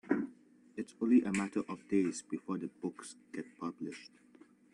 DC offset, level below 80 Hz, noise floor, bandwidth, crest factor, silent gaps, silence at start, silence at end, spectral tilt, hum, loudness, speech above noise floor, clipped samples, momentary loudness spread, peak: under 0.1%; -76 dBFS; -62 dBFS; 11 kHz; 20 dB; none; 0.05 s; 0.65 s; -6 dB/octave; none; -36 LUFS; 27 dB; under 0.1%; 17 LU; -16 dBFS